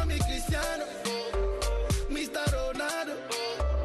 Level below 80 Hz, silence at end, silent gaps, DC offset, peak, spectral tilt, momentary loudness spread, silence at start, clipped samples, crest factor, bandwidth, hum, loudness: -34 dBFS; 0 s; none; under 0.1%; -16 dBFS; -4.5 dB/octave; 3 LU; 0 s; under 0.1%; 14 dB; 12.5 kHz; none; -31 LUFS